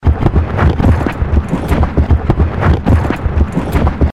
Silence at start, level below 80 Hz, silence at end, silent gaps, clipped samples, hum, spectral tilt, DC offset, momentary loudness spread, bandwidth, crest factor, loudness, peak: 0 s; -16 dBFS; 0 s; none; under 0.1%; none; -8.5 dB/octave; 2%; 4 LU; 12 kHz; 10 dB; -14 LUFS; -2 dBFS